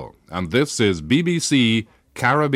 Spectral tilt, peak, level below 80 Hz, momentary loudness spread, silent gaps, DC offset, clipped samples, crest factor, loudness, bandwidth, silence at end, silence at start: -4.5 dB/octave; -6 dBFS; -50 dBFS; 11 LU; none; under 0.1%; under 0.1%; 14 dB; -19 LUFS; 15.5 kHz; 0 s; 0 s